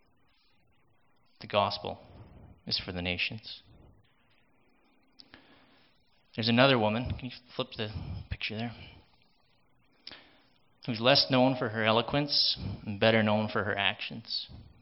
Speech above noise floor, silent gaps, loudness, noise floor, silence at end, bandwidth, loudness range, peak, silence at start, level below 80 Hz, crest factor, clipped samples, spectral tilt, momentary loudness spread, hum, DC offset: 41 dB; none; -29 LUFS; -70 dBFS; 0.2 s; 5.8 kHz; 13 LU; -6 dBFS; 1.4 s; -56 dBFS; 26 dB; under 0.1%; -9 dB/octave; 21 LU; none; under 0.1%